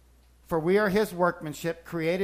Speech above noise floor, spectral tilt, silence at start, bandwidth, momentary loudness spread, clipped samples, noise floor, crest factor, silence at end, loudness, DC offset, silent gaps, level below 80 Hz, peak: 31 dB; -6 dB/octave; 0.5 s; 15.5 kHz; 10 LU; under 0.1%; -57 dBFS; 16 dB; 0 s; -27 LUFS; under 0.1%; none; -54 dBFS; -10 dBFS